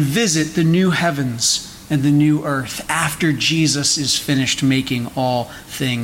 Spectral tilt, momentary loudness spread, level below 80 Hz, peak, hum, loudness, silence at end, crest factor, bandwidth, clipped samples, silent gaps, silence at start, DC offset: -4 dB/octave; 7 LU; -48 dBFS; -6 dBFS; none; -17 LUFS; 0 s; 12 dB; 17 kHz; under 0.1%; none; 0 s; under 0.1%